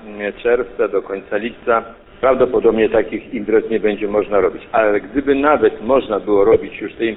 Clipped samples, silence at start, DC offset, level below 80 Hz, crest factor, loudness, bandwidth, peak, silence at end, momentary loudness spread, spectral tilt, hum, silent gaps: under 0.1%; 0 s; under 0.1%; -42 dBFS; 14 dB; -17 LUFS; 4 kHz; -2 dBFS; 0 s; 9 LU; -11 dB/octave; none; none